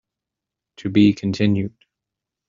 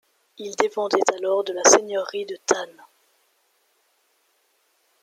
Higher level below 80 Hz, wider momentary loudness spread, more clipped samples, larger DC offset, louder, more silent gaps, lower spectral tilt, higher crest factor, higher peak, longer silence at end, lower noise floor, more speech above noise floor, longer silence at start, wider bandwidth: first, -56 dBFS vs -72 dBFS; second, 14 LU vs 17 LU; neither; neither; about the same, -19 LUFS vs -21 LUFS; neither; first, -7 dB/octave vs -1 dB/octave; second, 18 dB vs 24 dB; second, -4 dBFS vs 0 dBFS; second, 0.8 s vs 2.3 s; first, -85 dBFS vs -67 dBFS; first, 67 dB vs 45 dB; first, 0.8 s vs 0.4 s; second, 7.4 kHz vs 15 kHz